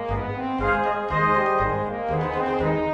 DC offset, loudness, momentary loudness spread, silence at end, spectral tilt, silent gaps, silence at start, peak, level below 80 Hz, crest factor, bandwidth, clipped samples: under 0.1%; -23 LUFS; 7 LU; 0 s; -8 dB/octave; none; 0 s; -10 dBFS; -40 dBFS; 14 dB; 8.4 kHz; under 0.1%